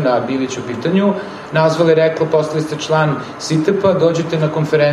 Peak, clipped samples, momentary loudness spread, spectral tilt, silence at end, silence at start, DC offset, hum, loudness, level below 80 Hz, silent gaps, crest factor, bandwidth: -2 dBFS; under 0.1%; 7 LU; -6 dB/octave; 0 s; 0 s; under 0.1%; none; -16 LUFS; -56 dBFS; none; 14 dB; 12 kHz